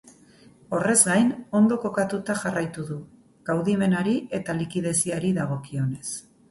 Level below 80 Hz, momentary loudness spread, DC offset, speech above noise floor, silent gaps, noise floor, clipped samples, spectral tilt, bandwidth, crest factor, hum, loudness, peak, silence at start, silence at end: -60 dBFS; 14 LU; under 0.1%; 29 dB; none; -53 dBFS; under 0.1%; -5 dB/octave; 12 kHz; 22 dB; none; -24 LUFS; -2 dBFS; 0.05 s; 0.3 s